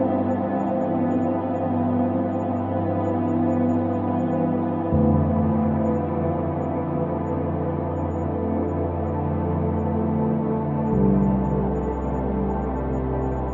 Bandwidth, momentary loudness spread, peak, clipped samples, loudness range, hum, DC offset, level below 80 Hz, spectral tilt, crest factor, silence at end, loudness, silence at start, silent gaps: 7.2 kHz; 5 LU; -8 dBFS; under 0.1%; 3 LU; none; under 0.1%; -38 dBFS; -11.5 dB/octave; 14 dB; 0 s; -23 LUFS; 0 s; none